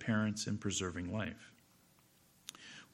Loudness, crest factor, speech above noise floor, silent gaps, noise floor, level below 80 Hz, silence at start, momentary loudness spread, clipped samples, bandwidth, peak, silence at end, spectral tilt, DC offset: -39 LUFS; 20 dB; 31 dB; none; -68 dBFS; -68 dBFS; 0 s; 18 LU; under 0.1%; 16.5 kHz; -20 dBFS; 0.1 s; -4.5 dB/octave; under 0.1%